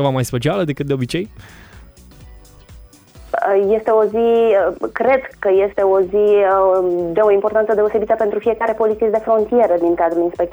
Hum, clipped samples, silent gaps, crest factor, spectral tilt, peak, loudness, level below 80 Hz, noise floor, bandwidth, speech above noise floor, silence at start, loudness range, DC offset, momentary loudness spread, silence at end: none; under 0.1%; none; 14 dB; -7 dB/octave; -2 dBFS; -16 LUFS; -46 dBFS; -42 dBFS; over 20 kHz; 26 dB; 0 s; 7 LU; under 0.1%; 6 LU; 0 s